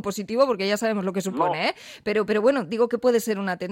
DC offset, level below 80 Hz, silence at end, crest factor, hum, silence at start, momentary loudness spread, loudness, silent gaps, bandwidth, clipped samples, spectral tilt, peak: under 0.1%; -64 dBFS; 0 s; 16 dB; none; 0.05 s; 6 LU; -24 LUFS; none; 16.5 kHz; under 0.1%; -5 dB/octave; -8 dBFS